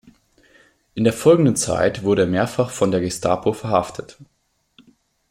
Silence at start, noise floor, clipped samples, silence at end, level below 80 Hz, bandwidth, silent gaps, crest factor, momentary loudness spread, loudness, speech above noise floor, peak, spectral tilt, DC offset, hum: 0.95 s; -59 dBFS; under 0.1%; 1.05 s; -52 dBFS; 16.5 kHz; none; 18 dB; 7 LU; -19 LUFS; 40 dB; -2 dBFS; -5.5 dB/octave; under 0.1%; none